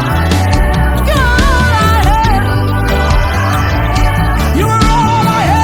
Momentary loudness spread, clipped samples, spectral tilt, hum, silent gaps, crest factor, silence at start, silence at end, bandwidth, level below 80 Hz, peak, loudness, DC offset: 3 LU; under 0.1%; -5.5 dB/octave; none; none; 10 dB; 0 s; 0 s; 19 kHz; -14 dBFS; 0 dBFS; -11 LUFS; under 0.1%